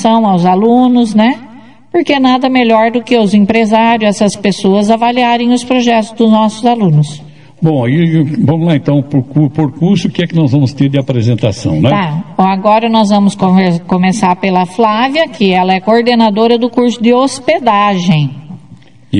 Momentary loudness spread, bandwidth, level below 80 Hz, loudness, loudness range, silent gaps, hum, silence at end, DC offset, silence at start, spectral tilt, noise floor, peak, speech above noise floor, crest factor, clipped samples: 4 LU; 10.5 kHz; -50 dBFS; -10 LUFS; 2 LU; none; none; 0 s; 0.9%; 0 s; -6.5 dB/octave; -38 dBFS; 0 dBFS; 29 dB; 10 dB; 0.4%